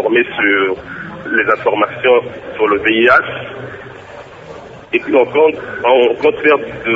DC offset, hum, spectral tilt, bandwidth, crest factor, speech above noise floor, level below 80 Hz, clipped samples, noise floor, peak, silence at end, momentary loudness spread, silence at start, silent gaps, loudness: under 0.1%; none; -6.5 dB/octave; 7.4 kHz; 14 dB; 20 dB; -50 dBFS; under 0.1%; -33 dBFS; 0 dBFS; 0 s; 22 LU; 0 s; none; -13 LUFS